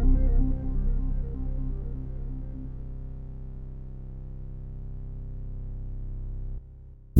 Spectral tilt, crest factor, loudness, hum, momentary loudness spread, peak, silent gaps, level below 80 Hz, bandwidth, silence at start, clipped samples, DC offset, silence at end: -11 dB/octave; 22 dB; -35 LUFS; none; 13 LU; -6 dBFS; none; -30 dBFS; 1.6 kHz; 0 s; under 0.1%; under 0.1%; 0 s